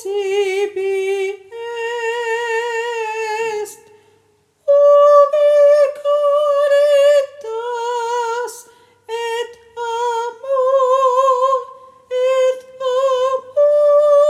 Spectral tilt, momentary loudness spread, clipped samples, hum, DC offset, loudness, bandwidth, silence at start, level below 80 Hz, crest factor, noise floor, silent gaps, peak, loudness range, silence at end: -1.5 dB/octave; 14 LU; under 0.1%; none; under 0.1%; -16 LUFS; 13 kHz; 0 s; -74 dBFS; 16 dB; -58 dBFS; none; 0 dBFS; 9 LU; 0 s